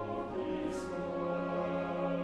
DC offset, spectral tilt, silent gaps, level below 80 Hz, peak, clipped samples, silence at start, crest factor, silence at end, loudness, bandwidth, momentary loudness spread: under 0.1%; -7 dB/octave; none; -60 dBFS; -24 dBFS; under 0.1%; 0 s; 12 dB; 0 s; -36 LUFS; 11.5 kHz; 3 LU